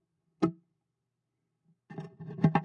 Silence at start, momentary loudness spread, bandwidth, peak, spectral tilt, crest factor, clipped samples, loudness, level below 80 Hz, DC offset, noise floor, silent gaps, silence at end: 0.4 s; 17 LU; 6.8 kHz; -12 dBFS; -9 dB/octave; 24 dB; under 0.1%; -32 LUFS; -68 dBFS; under 0.1%; -84 dBFS; none; 0 s